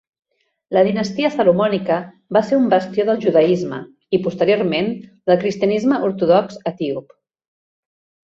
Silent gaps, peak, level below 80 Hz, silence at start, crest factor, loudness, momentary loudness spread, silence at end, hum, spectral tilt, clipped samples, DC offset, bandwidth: none; -2 dBFS; -60 dBFS; 0.7 s; 16 dB; -18 LUFS; 9 LU; 1.3 s; none; -7 dB/octave; under 0.1%; under 0.1%; 7.6 kHz